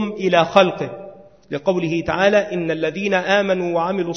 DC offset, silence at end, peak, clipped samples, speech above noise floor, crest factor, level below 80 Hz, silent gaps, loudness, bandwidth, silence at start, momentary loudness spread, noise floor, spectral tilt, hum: 0.2%; 0 s; 0 dBFS; under 0.1%; 22 dB; 18 dB; -52 dBFS; none; -18 LUFS; 6.6 kHz; 0 s; 11 LU; -40 dBFS; -5.5 dB/octave; none